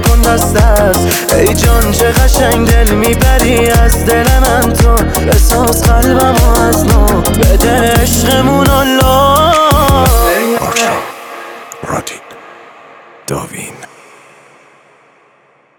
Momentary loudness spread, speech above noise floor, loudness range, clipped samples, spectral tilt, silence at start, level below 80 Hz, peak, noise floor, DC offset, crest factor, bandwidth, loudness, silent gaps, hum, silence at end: 13 LU; 41 dB; 16 LU; under 0.1%; -4.5 dB/octave; 0 s; -14 dBFS; 0 dBFS; -49 dBFS; under 0.1%; 10 dB; 20 kHz; -9 LUFS; none; none; 1.95 s